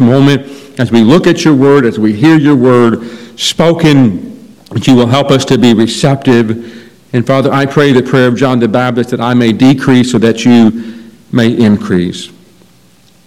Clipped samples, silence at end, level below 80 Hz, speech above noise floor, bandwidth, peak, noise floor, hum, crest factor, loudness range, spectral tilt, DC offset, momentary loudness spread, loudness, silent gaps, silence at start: 6%; 1 s; -44 dBFS; 37 dB; 13.5 kHz; 0 dBFS; -45 dBFS; none; 8 dB; 2 LU; -6 dB/octave; under 0.1%; 11 LU; -8 LUFS; none; 0 s